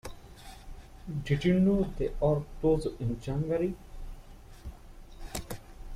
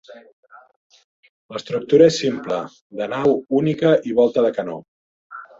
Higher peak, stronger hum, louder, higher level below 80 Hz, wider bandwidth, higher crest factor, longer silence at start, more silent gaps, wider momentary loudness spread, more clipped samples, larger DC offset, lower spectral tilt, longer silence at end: second, -14 dBFS vs -2 dBFS; neither; second, -30 LUFS vs -19 LUFS; first, -42 dBFS vs -62 dBFS; first, 15.5 kHz vs 7.8 kHz; about the same, 18 dB vs 18 dB; about the same, 0.05 s vs 0.1 s; second, none vs 0.33-0.43 s, 0.76-0.90 s, 1.04-1.23 s, 1.29-1.49 s, 2.81-2.90 s, 4.88-5.30 s; first, 23 LU vs 20 LU; neither; neither; first, -7.5 dB/octave vs -6 dB/octave; second, 0 s vs 0.15 s